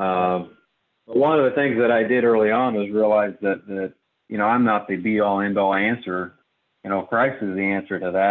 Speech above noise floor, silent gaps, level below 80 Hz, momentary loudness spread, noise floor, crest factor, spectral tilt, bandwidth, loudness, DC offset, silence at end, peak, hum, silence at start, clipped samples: 45 dB; none; -60 dBFS; 11 LU; -65 dBFS; 14 dB; -9.5 dB/octave; 4.3 kHz; -21 LUFS; under 0.1%; 0 s; -6 dBFS; none; 0 s; under 0.1%